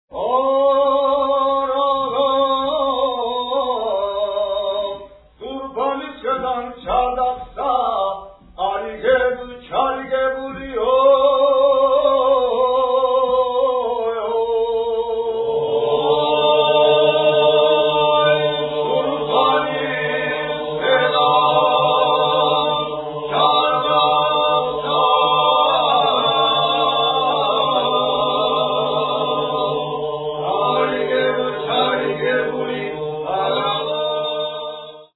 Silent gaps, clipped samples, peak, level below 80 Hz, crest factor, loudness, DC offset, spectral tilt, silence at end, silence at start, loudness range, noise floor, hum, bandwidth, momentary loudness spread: none; under 0.1%; 0 dBFS; -50 dBFS; 16 dB; -18 LUFS; under 0.1%; -7 dB/octave; 0.1 s; 0.1 s; 6 LU; -38 dBFS; none; 4.1 kHz; 9 LU